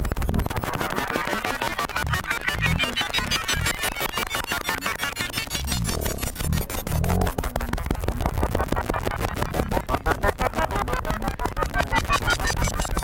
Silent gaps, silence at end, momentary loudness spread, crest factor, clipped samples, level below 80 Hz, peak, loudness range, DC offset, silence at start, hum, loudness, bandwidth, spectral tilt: none; 0 s; 5 LU; 18 dB; under 0.1%; -32 dBFS; -8 dBFS; 2 LU; under 0.1%; 0 s; none; -25 LUFS; 17 kHz; -4 dB/octave